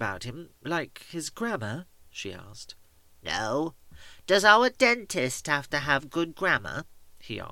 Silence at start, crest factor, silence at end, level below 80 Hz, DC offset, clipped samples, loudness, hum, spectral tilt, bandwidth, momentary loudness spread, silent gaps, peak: 0 s; 24 dB; 0 s; -58 dBFS; under 0.1%; under 0.1%; -26 LUFS; none; -3.5 dB/octave; 17 kHz; 21 LU; none; -4 dBFS